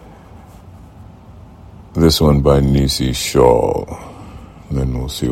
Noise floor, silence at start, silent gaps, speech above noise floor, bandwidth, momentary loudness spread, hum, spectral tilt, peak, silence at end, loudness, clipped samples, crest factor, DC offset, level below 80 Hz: -39 dBFS; 0.1 s; none; 25 dB; 16.5 kHz; 20 LU; none; -6 dB/octave; 0 dBFS; 0 s; -15 LUFS; under 0.1%; 16 dB; under 0.1%; -26 dBFS